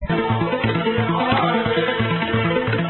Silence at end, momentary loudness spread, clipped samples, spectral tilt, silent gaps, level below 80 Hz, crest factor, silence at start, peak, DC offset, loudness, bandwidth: 0 s; 2 LU; under 0.1%; -11.5 dB/octave; none; -40 dBFS; 14 dB; 0 s; -6 dBFS; under 0.1%; -20 LUFS; 4.3 kHz